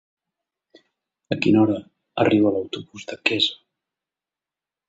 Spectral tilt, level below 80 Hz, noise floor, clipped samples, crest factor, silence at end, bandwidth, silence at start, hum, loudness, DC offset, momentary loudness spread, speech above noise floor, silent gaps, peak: -6 dB/octave; -60 dBFS; -89 dBFS; under 0.1%; 22 dB; 1.35 s; 8 kHz; 1.3 s; none; -21 LUFS; under 0.1%; 15 LU; 69 dB; none; -2 dBFS